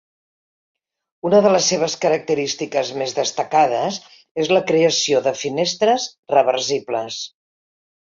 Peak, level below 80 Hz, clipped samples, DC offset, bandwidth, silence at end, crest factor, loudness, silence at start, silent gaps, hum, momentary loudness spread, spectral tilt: -2 dBFS; -66 dBFS; under 0.1%; under 0.1%; 7.6 kHz; 0.9 s; 18 dB; -19 LUFS; 1.25 s; 4.31-4.35 s, 6.19-6.23 s; none; 10 LU; -3 dB/octave